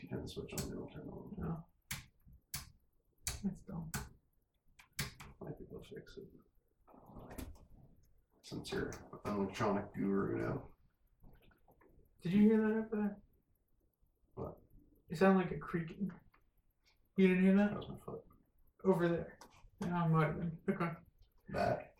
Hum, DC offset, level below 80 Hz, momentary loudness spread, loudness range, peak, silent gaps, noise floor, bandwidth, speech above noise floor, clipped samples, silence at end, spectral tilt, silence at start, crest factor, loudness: none; under 0.1%; -62 dBFS; 21 LU; 14 LU; -16 dBFS; none; -77 dBFS; 17.5 kHz; 41 dB; under 0.1%; 0.1 s; -6.5 dB/octave; 0 s; 22 dB; -37 LUFS